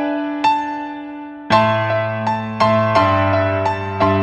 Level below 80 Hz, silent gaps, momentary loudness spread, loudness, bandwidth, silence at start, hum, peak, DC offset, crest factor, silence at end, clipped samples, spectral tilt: -50 dBFS; none; 13 LU; -17 LUFS; 9.6 kHz; 0 s; none; 0 dBFS; under 0.1%; 16 dB; 0 s; under 0.1%; -7 dB/octave